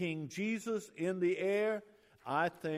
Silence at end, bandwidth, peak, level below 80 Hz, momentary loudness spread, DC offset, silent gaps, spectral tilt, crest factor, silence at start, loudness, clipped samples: 0 s; 15 kHz; -20 dBFS; -80 dBFS; 7 LU; under 0.1%; none; -6 dB/octave; 16 dB; 0 s; -36 LUFS; under 0.1%